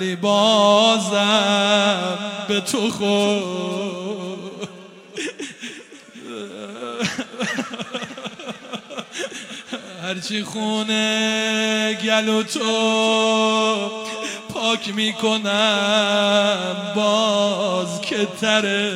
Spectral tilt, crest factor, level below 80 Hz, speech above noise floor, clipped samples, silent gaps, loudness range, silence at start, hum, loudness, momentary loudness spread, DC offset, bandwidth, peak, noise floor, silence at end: -3.5 dB/octave; 18 dB; -68 dBFS; 22 dB; under 0.1%; none; 10 LU; 0 s; none; -19 LUFS; 16 LU; under 0.1%; 15.5 kHz; -2 dBFS; -41 dBFS; 0 s